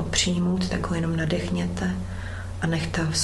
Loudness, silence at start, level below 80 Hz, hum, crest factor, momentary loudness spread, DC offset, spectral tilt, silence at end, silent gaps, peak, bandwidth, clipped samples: -26 LUFS; 0 s; -38 dBFS; none; 18 dB; 9 LU; under 0.1%; -4.5 dB/octave; 0 s; none; -8 dBFS; 12 kHz; under 0.1%